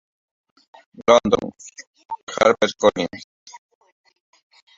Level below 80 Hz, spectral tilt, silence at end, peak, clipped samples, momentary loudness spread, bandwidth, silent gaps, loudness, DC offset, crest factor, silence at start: -56 dBFS; -4 dB/octave; 1.2 s; 0 dBFS; under 0.1%; 22 LU; 7.8 kHz; 1.87-1.93 s, 2.05-2.09 s, 2.23-2.27 s, 3.24-3.46 s; -19 LUFS; under 0.1%; 22 dB; 1 s